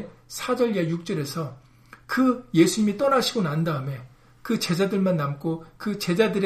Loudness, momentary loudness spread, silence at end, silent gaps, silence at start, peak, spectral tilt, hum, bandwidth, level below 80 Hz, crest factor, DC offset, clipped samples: -24 LUFS; 12 LU; 0 s; none; 0 s; -6 dBFS; -5.5 dB/octave; none; 15.5 kHz; -58 dBFS; 18 dB; under 0.1%; under 0.1%